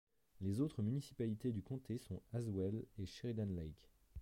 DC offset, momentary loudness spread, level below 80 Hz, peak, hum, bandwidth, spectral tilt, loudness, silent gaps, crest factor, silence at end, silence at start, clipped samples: under 0.1%; 8 LU; -64 dBFS; -28 dBFS; none; 16 kHz; -8 dB/octave; -44 LUFS; none; 16 dB; 0 s; 0.4 s; under 0.1%